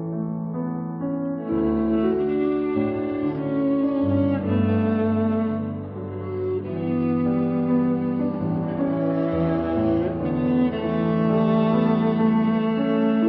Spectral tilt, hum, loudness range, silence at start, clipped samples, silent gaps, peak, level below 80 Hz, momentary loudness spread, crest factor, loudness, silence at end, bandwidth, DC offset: -11.5 dB/octave; none; 3 LU; 0 s; under 0.1%; none; -10 dBFS; -50 dBFS; 8 LU; 12 dB; -23 LUFS; 0 s; 4.9 kHz; under 0.1%